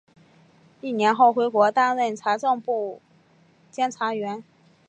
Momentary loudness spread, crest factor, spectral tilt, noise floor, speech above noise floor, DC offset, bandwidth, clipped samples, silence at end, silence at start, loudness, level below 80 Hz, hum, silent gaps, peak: 15 LU; 18 dB; -4.5 dB/octave; -58 dBFS; 36 dB; under 0.1%; 8.8 kHz; under 0.1%; 0.45 s; 0.85 s; -22 LUFS; -80 dBFS; none; none; -6 dBFS